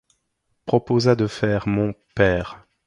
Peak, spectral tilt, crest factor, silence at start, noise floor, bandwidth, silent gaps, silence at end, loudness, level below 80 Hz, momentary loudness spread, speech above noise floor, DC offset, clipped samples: -4 dBFS; -7 dB/octave; 18 dB; 0.65 s; -72 dBFS; 10.5 kHz; none; 0.3 s; -21 LUFS; -44 dBFS; 8 LU; 52 dB; under 0.1%; under 0.1%